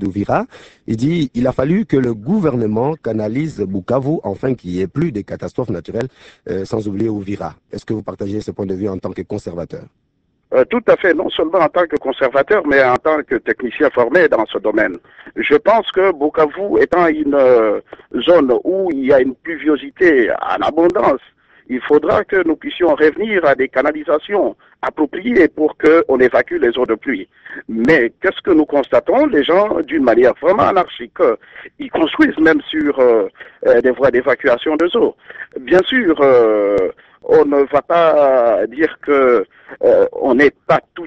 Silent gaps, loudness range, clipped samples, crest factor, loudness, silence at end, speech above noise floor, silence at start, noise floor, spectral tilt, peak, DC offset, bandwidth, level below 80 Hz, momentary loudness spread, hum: none; 8 LU; under 0.1%; 14 dB; -15 LUFS; 0 s; 39 dB; 0 s; -53 dBFS; -7.5 dB/octave; 0 dBFS; under 0.1%; 8.2 kHz; -48 dBFS; 12 LU; none